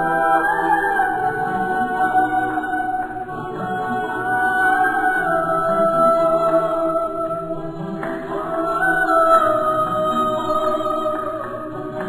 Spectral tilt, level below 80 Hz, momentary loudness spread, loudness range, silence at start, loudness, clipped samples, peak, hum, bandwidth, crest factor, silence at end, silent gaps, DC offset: -6 dB/octave; -48 dBFS; 11 LU; 3 LU; 0 s; -19 LUFS; under 0.1%; -4 dBFS; none; 15 kHz; 16 dB; 0 s; none; under 0.1%